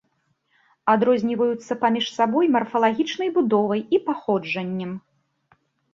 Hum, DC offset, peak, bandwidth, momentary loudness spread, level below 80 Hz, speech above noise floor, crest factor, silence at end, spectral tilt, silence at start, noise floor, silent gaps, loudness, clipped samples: none; under 0.1%; -4 dBFS; 7.6 kHz; 8 LU; -68 dBFS; 48 dB; 18 dB; 0.95 s; -6 dB/octave; 0.85 s; -70 dBFS; none; -22 LUFS; under 0.1%